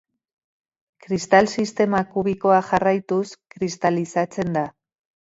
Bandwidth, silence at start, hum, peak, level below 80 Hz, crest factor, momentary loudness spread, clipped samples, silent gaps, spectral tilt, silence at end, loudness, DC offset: 8 kHz; 1.1 s; none; 0 dBFS; -58 dBFS; 22 dB; 11 LU; under 0.1%; none; -5.5 dB/octave; 0.55 s; -21 LUFS; under 0.1%